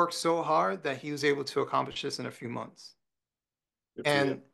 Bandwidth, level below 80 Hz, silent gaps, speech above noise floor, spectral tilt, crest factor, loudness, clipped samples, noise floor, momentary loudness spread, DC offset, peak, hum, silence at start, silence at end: 12.5 kHz; -74 dBFS; none; over 59 dB; -4.5 dB/octave; 20 dB; -30 LUFS; under 0.1%; under -90 dBFS; 12 LU; under 0.1%; -10 dBFS; none; 0 s; 0.1 s